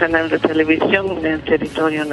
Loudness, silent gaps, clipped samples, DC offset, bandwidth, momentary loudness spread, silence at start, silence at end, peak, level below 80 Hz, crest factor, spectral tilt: -17 LUFS; none; under 0.1%; under 0.1%; 11.5 kHz; 4 LU; 0 s; 0 s; 0 dBFS; -44 dBFS; 16 dB; -6 dB/octave